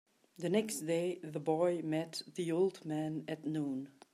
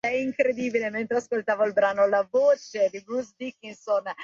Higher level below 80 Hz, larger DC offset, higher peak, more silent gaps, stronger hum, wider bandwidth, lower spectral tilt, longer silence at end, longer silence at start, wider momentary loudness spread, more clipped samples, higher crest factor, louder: second, -84 dBFS vs -70 dBFS; neither; second, -18 dBFS vs -10 dBFS; neither; neither; first, 15 kHz vs 7.4 kHz; about the same, -5.5 dB/octave vs -4.5 dB/octave; first, 0.25 s vs 0 s; first, 0.4 s vs 0.05 s; second, 7 LU vs 11 LU; neither; about the same, 18 dB vs 14 dB; second, -37 LUFS vs -25 LUFS